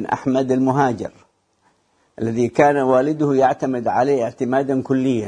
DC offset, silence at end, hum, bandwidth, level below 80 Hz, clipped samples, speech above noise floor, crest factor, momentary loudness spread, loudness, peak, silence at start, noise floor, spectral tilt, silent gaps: under 0.1%; 0 s; none; 10 kHz; -58 dBFS; under 0.1%; 44 dB; 18 dB; 6 LU; -18 LUFS; 0 dBFS; 0 s; -62 dBFS; -7 dB/octave; none